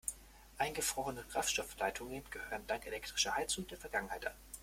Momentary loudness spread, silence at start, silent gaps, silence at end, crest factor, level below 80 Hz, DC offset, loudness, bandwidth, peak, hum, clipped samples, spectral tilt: 10 LU; 0.05 s; none; 0 s; 22 dB; -60 dBFS; under 0.1%; -39 LUFS; 16.5 kHz; -18 dBFS; none; under 0.1%; -1.5 dB/octave